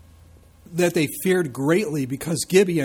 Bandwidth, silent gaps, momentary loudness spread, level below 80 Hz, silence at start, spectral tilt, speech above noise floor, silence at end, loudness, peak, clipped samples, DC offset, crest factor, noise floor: over 20 kHz; none; 7 LU; -56 dBFS; 0.7 s; -5 dB/octave; 29 dB; 0 s; -22 LUFS; -6 dBFS; under 0.1%; under 0.1%; 16 dB; -50 dBFS